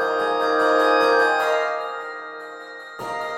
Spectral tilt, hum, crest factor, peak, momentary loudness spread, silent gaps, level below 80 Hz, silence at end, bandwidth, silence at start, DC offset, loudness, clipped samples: -3 dB/octave; none; 16 dB; -6 dBFS; 18 LU; none; -72 dBFS; 0 s; 14.5 kHz; 0 s; under 0.1%; -20 LUFS; under 0.1%